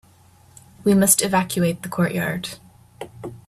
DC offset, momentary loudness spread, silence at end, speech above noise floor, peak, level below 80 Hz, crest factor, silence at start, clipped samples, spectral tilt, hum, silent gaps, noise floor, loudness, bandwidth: under 0.1%; 23 LU; 0.1 s; 33 dB; 0 dBFS; -56 dBFS; 22 dB; 0.8 s; under 0.1%; -4 dB/octave; none; none; -52 dBFS; -19 LUFS; 15.5 kHz